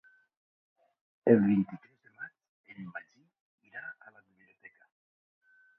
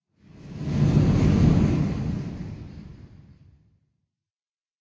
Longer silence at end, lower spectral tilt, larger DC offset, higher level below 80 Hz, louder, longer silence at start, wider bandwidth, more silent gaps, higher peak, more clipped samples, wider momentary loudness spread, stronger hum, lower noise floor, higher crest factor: about the same, 1.85 s vs 1.75 s; first, -11 dB/octave vs -8.5 dB/octave; neither; second, -74 dBFS vs -36 dBFS; second, -27 LUFS vs -22 LUFS; first, 1.25 s vs 0.45 s; second, 3.3 kHz vs 7.8 kHz; first, 2.49-2.64 s, 3.40-3.58 s vs none; about the same, -8 dBFS vs -8 dBFS; neither; first, 25 LU vs 22 LU; neither; second, -64 dBFS vs under -90 dBFS; first, 26 dB vs 18 dB